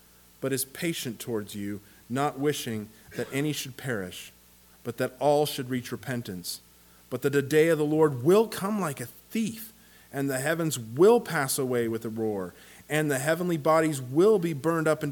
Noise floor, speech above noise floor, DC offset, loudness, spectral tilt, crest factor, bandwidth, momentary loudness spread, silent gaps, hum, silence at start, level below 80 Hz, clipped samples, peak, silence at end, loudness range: -55 dBFS; 28 dB; under 0.1%; -27 LUFS; -5 dB/octave; 18 dB; 19 kHz; 15 LU; none; none; 0.4 s; -66 dBFS; under 0.1%; -10 dBFS; 0 s; 6 LU